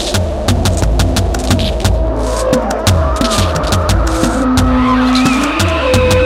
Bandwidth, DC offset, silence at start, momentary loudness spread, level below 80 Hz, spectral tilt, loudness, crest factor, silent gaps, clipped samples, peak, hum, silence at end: 16.5 kHz; under 0.1%; 0 s; 4 LU; -18 dBFS; -5 dB/octave; -13 LUFS; 12 dB; none; under 0.1%; 0 dBFS; none; 0 s